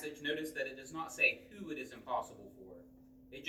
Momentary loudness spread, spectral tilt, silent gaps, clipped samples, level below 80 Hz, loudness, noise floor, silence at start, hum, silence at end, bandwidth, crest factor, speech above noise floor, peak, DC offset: 23 LU; -3 dB/octave; none; under 0.1%; -72 dBFS; -37 LUFS; -60 dBFS; 0 s; none; 0 s; over 20 kHz; 24 dB; 20 dB; -16 dBFS; under 0.1%